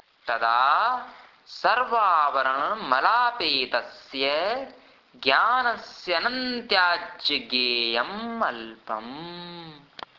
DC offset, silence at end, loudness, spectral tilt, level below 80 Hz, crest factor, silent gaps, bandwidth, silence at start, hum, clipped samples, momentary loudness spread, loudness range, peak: under 0.1%; 0.4 s; -24 LUFS; -3.5 dB/octave; -66 dBFS; 22 dB; none; 6 kHz; 0.25 s; none; under 0.1%; 17 LU; 3 LU; -4 dBFS